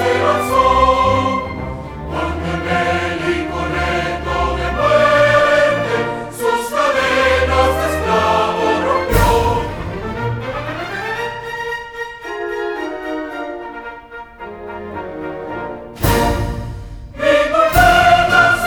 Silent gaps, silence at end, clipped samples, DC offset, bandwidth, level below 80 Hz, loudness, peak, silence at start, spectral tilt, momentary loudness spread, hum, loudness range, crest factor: none; 0 s; under 0.1%; under 0.1%; over 20 kHz; -30 dBFS; -16 LUFS; 0 dBFS; 0 s; -5 dB/octave; 16 LU; none; 11 LU; 16 dB